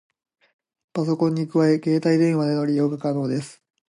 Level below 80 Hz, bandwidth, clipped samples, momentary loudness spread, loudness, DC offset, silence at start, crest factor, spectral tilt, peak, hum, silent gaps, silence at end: -70 dBFS; 11.5 kHz; under 0.1%; 9 LU; -22 LUFS; under 0.1%; 0.95 s; 14 dB; -7.5 dB/octave; -8 dBFS; none; none; 0.4 s